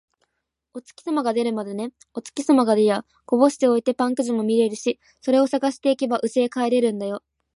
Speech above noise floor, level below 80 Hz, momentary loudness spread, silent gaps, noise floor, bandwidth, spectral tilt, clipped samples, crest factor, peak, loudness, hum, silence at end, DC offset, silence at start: 53 dB; -74 dBFS; 14 LU; none; -75 dBFS; 11.5 kHz; -5 dB/octave; under 0.1%; 18 dB; -4 dBFS; -22 LUFS; none; 0.35 s; under 0.1%; 0.75 s